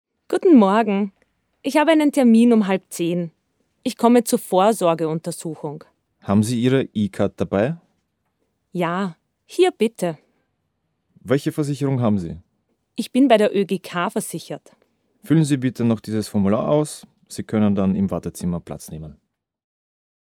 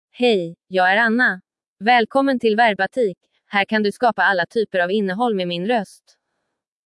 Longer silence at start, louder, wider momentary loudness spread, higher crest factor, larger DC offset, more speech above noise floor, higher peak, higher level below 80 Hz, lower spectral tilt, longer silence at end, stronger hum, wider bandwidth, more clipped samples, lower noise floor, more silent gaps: about the same, 0.3 s vs 0.2 s; about the same, -20 LUFS vs -19 LUFS; first, 18 LU vs 7 LU; about the same, 20 dB vs 16 dB; neither; second, 54 dB vs 59 dB; about the same, -2 dBFS vs -4 dBFS; first, -56 dBFS vs -72 dBFS; about the same, -6.5 dB/octave vs -5.5 dB/octave; first, 1.2 s vs 1 s; neither; first, 18 kHz vs 12 kHz; neither; second, -73 dBFS vs -77 dBFS; second, none vs 1.67-1.76 s